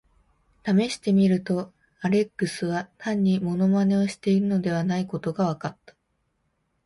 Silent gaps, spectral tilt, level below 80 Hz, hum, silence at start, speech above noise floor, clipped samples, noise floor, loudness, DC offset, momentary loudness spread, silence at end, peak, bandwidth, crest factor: none; -7 dB/octave; -62 dBFS; none; 0.65 s; 50 dB; under 0.1%; -73 dBFS; -24 LUFS; under 0.1%; 9 LU; 1.15 s; -10 dBFS; 11.5 kHz; 14 dB